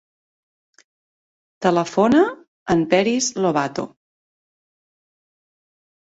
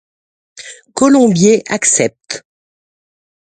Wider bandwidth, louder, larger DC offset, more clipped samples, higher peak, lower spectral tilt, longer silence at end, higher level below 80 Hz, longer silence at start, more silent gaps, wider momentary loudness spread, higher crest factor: second, 8 kHz vs 9.6 kHz; second, -19 LUFS vs -11 LUFS; neither; neither; second, -4 dBFS vs 0 dBFS; about the same, -4.5 dB/octave vs -4 dB/octave; first, 2.15 s vs 1.05 s; about the same, -58 dBFS vs -56 dBFS; first, 1.6 s vs 0.6 s; first, 2.48-2.66 s vs none; second, 12 LU vs 23 LU; first, 20 dB vs 14 dB